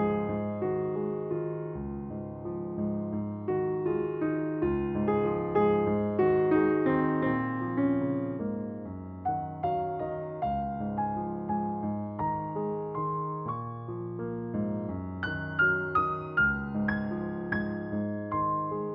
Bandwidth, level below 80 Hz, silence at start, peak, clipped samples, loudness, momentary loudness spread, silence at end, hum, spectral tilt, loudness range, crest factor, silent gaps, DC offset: 5.4 kHz; -54 dBFS; 0 s; -14 dBFS; under 0.1%; -30 LUFS; 10 LU; 0 s; none; -7 dB/octave; 6 LU; 16 dB; none; under 0.1%